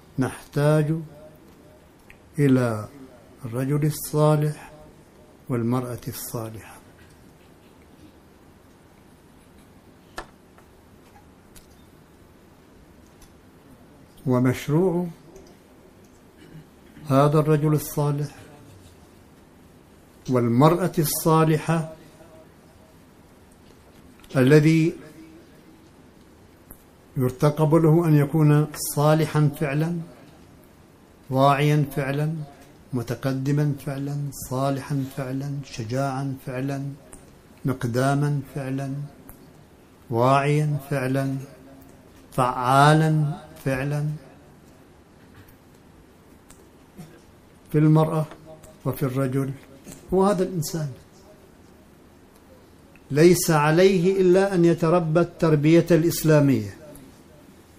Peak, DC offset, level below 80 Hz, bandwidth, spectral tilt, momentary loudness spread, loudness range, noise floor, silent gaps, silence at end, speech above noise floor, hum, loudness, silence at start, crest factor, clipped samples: -2 dBFS; under 0.1%; -54 dBFS; 15.5 kHz; -6.5 dB/octave; 17 LU; 9 LU; -52 dBFS; none; 0.8 s; 31 dB; none; -22 LUFS; 0.15 s; 22 dB; under 0.1%